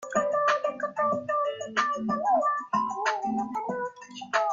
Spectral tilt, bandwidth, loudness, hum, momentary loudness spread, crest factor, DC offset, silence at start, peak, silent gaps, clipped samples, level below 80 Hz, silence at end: -4 dB/octave; 7.6 kHz; -28 LUFS; none; 7 LU; 18 dB; under 0.1%; 0 s; -10 dBFS; none; under 0.1%; -70 dBFS; 0 s